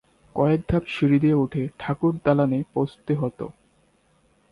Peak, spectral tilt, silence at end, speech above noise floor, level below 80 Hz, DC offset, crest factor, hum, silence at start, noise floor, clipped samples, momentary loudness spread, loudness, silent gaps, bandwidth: -6 dBFS; -9.5 dB/octave; 1 s; 40 dB; -46 dBFS; under 0.1%; 18 dB; none; 0.35 s; -63 dBFS; under 0.1%; 10 LU; -23 LUFS; none; 11 kHz